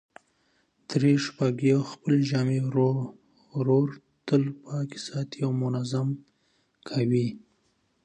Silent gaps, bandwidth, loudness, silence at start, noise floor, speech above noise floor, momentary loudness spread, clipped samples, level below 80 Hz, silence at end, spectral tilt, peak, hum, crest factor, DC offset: none; 9.2 kHz; -27 LUFS; 0.9 s; -70 dBFS; 45 dB; 10 LU; under 0.1%; -70 dBFS; 0.65 s; -7.5 dB/octave; -10 dBFS; none; 18 dB; under 0.1%